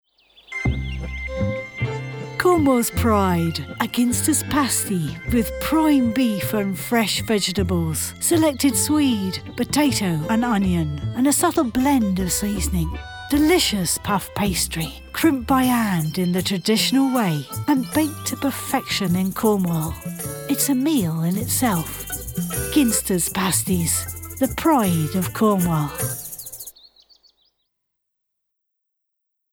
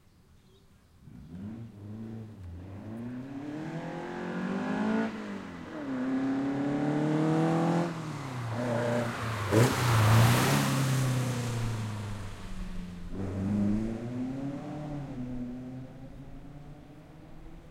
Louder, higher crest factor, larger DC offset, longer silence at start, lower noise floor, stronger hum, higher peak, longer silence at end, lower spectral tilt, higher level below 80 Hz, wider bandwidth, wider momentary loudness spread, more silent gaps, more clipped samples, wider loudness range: first, -21 LUFS vs -31 LUFS; about the same, 16 dB vs 20 dB; neither; second, 0.5 s vs 1 s; first, -78 dBFS vs -59 dBFS; neither; first, -6 dBFS vs -12 dBFS; first, 2.85 s vs 0 s; second, -4.5 dB/octave vs -6 dB/octave; first, -38 dBFS vs -50 dBFS; first, over 20 kHz vs 16.5 kHz; second, 9 LU vs 22 LU; neither; neither; second, 2 LU vs 14 LU